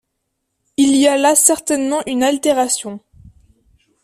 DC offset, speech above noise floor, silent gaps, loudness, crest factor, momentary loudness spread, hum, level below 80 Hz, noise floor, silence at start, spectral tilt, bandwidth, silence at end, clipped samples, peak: under 0.1%; 57 dB; none; -14 LUFS; 18 dB; 13 LU; none; -56 dBFS; -73 dBFS; 0.8 s; -1.5 dB/octave; 15.5 kHz; 1.05 s; under 0.1%; 0 dBFS